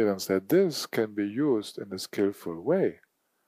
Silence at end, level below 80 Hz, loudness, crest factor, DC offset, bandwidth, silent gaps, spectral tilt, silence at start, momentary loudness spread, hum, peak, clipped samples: 0.5 s; -74 dBFS; -28 LUFS; 16 dB; under 0.1%; 15.5 kHz; none; -5.5 dB/octave; 0 s; 10 LU; none; -12 dBFS; under 0.1%